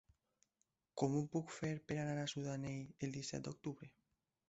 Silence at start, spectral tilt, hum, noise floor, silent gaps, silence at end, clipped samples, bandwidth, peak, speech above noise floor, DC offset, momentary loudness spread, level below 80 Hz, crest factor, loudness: 0.95 s; -6 dB/octave; none; -86 dBFS; none; 0.6 s; under 0.1%; 8 kHz; -22 dBFS; 43 dB; under 0.1%; 10 LU; -74 dBFS; 22 dB; -44 LUFS